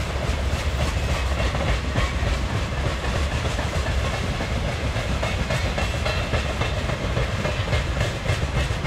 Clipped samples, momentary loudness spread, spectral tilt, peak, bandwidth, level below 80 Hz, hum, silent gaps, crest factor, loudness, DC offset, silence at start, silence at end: under 0.1%; 2 LU; -5 dB/octave; -8 dBFS; 14.5 kHz; -28 dBFS; none; none; 14 dB; -25 LUFS; under 0.1%; 0 s; 0 s